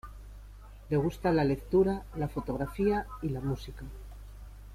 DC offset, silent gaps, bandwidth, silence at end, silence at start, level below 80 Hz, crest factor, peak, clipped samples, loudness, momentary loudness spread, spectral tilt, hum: under 0.1%; none; 15.5 kHz; 0 s; 0.05 s; -46 dBFS; 16 dB; -14 dBFS; under 0.1%; -31 LUFS; 23 LU; -8 dB/octave; none